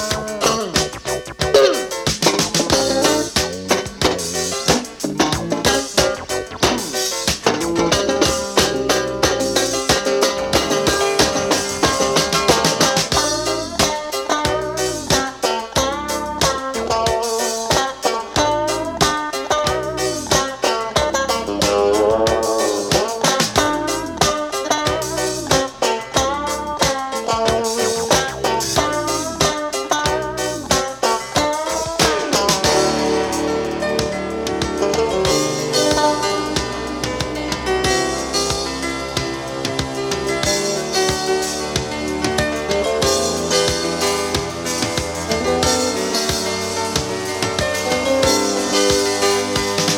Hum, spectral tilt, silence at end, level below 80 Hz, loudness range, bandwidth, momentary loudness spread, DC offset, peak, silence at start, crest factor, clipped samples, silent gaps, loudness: none; -3 dB/octave; 0 s; -38 dBFS; 3 LU; 19 kHz; 6 LU; under 0.1%; 0 dBFS; 0 s; 18 dB; under 0.1%; none; -18 LUFS